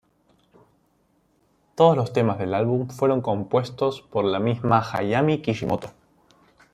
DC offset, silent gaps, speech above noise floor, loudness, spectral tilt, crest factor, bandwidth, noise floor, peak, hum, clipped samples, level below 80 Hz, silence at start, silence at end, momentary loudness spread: under 0.1%; none; 43 dB; -23 LUFS; -7.5 dB/octave; 20 dB; 13.5 kHz; -65 dBFS; -4 dBFS; none; under 0.1%; -60 dBFS; 1.75 s; 0.85 s; 8 LU